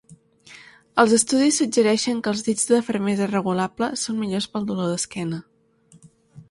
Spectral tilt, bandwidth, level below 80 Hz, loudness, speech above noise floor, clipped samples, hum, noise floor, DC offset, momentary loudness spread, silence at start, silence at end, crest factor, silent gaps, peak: -4 dB/octave; 11.5 kHz; -62 dBFS; -21 LUFS; 34 dB; under 0.1%; none; -55 dBFS; under 0.1%; 9 LU; 0.1 s; 0.1 s; 22 dB; none; -2 dBFS